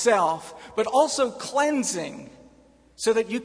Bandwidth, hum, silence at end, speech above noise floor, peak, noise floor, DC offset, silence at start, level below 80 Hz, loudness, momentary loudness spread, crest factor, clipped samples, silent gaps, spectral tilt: 11 kHz; none; 0 s; 32 dB; -8 dBFS; -56 dBFS; under 0.1%; 0 s; -64 dBFS; -24 LUFS; 12 LU; 18 dB; under 0.1%; none; -3 dB/octave